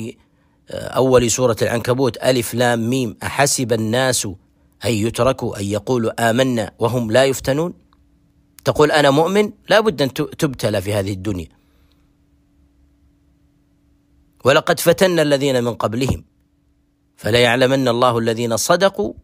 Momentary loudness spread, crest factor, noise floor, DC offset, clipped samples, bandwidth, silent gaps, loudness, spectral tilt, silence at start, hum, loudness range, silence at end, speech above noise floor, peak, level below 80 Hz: 9 LU; 18 dB; -61 dBFS; under 0.1%; under 0.1%; 16 kHz; none; -17 LUFS; -4.5 dB/octave; 0 s; none; 7 LU; 0.05 s; 44 dB; 0 dBFS; -46 dBFS